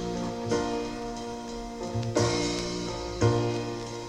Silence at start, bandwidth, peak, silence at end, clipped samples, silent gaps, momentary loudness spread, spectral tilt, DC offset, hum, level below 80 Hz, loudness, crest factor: 0 s; 12 kHz; -10 dBFS; 0 s; under 0.1%; none; 10 LU; -5 dB/octave; under 0.1%; none; -46 dBFS; -30 LUFS; 20 dB